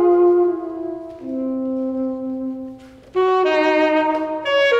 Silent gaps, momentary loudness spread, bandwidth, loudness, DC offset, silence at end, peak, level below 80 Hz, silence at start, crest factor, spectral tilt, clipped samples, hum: none; 13 LU; 7.6 kHz; -19 LUFS; under 0.1%; 0 s; -6 dBFS; -58 dBFS; 0 s; 12 dB; -5 dB/octave; under 0.1%; none